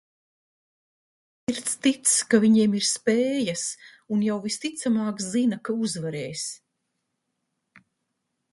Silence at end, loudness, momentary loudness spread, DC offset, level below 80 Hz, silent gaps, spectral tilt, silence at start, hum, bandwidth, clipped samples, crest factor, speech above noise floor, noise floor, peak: 1.95 s; -24 LUFS; 12 LU; under 0.1%; -70 dBFS; none; -3.5 dB/octave; 1.5 s; none; 11.5 kHz; under 0.1%; 20 dB; 55 dB; -79 dBFS; -6 dBFS